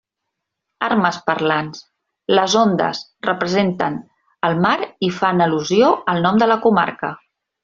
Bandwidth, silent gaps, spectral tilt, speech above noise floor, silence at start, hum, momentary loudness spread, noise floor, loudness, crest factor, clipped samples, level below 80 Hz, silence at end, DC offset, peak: 7.6 kHz; none; -5 dB/octave; 62 dB; 0.8 s; none; 10 LU; -79 dBFS; -18 LUFS; 16 dB; under 0.1%; -60 dBFS; 0.45 s; under 0.1%; -2 dBFS